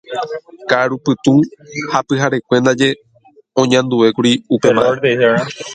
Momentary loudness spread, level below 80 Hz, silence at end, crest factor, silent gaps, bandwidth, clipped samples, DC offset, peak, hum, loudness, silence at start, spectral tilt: 11 LU; -56 dBFS; 0 s; 14 dB; none; 9.4 kHz; under 0.1%; under 0.1%; 0 dBFS; none; -14 LUFS; 0.1 s; -5 dB/octave